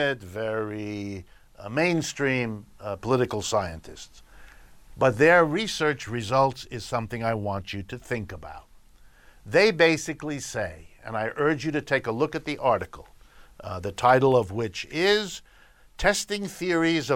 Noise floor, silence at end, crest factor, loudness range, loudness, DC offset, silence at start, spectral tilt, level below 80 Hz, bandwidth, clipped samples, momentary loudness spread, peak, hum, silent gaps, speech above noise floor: -54 dBFS; 0 s; 20 dB; 4 LU; -25 LUFS; under 0.1%; 0 s; -4.5 dB/octave; -50 dBFS; 16.5 kHz; under 0.1%; 17 LU; -6 dBFS; none; none; 29 dB